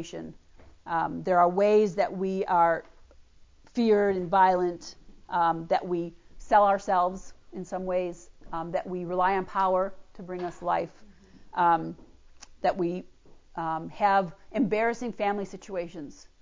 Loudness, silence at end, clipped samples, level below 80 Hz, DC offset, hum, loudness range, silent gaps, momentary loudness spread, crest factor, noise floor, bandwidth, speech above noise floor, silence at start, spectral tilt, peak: -27 LUFS; 0.25 s; under 0.1%; -56 dBFS; under 0.1%; none; 5 LU; none; 17 LU; 18 dB; -55 dBFS; 7.6 kHz; 28 dB; 0 s; -6.5 dB/octave; -10 dBFS